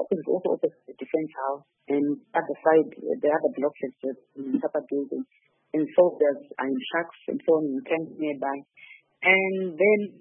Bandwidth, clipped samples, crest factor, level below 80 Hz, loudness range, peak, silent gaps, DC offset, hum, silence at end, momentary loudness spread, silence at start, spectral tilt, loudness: 3.6 kHz; under 0.1%; 20 dB; -82 dBFS; 2 LU; -6 dBFS; none; under 0.1%; none; 0.1 s; 12 LU; 0 s; -10 dB/octave; -26 LUFS